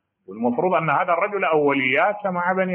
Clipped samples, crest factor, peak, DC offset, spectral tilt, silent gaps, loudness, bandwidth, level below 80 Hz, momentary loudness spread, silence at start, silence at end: under 0.1%; 14 dB; -6 dBFS; under 0.1%; -4 dB/octave; none; -20 LUFS; 4 kHz; -72 dBFS; 6 LU; 0.3 s; 0 s